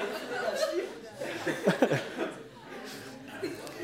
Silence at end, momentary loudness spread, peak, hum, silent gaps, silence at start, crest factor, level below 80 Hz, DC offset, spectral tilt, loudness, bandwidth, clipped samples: 0 s; 16 LU; -8 dBFS; none; none; 0 s; 24 dB; -70 dBFS; under 0.1%; -5 dB/octave; -33 LUFS; 16 kHz; under 0.1%